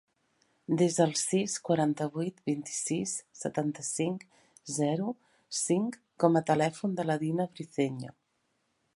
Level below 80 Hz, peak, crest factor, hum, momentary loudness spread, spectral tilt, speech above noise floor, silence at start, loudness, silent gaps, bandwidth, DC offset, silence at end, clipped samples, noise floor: -76 dBFS; -8 dBFS; 22 dB; none; 11 LU; -5 dB/octave; 47 dB; 0.7 s; -31 LUFS; none; 11.5 kHz; under 0.1%; 0.85 s; under 0.1%; -77 dBFS